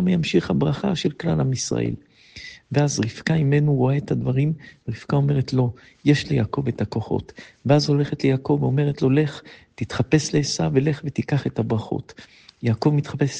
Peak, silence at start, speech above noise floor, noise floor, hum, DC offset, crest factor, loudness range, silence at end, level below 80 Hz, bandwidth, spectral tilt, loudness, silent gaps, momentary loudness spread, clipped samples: -2 dBFS; 0 s; 21 dB; -42 dBFS; none; under 0.1%; 18 dB; 2 LU; 0 s; -50 dBFS; 9.2 kHz; -6.5 dB/octave; -22 LUFS; none; 11 LU; under 0.1%